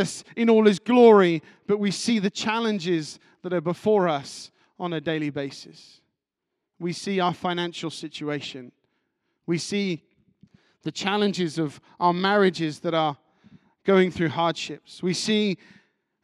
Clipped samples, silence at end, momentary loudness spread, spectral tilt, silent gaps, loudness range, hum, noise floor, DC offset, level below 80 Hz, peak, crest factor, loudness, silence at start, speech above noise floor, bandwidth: under 0.1%; 0.7 s; 16 LU; -5.5 dB/octave; none; 9 LU; none; -83 dBFS; under 0.1%; -68 dBFS; -4 dBFS; 20 dB; -24 LUFS; 0 s; 60 dB; 12 kHz